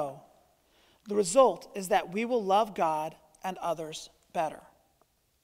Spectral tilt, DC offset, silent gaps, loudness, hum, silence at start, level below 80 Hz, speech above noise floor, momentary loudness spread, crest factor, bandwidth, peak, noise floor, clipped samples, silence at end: -4 dB/octave; under 0.1%; none; -29 LUFS; none; 0 s; -68 dBFS; 42 dB; 16 LU; 22 dB; 16 kHz; -8 dBFS; -70 dBFS; under 0.1%; 0.85 s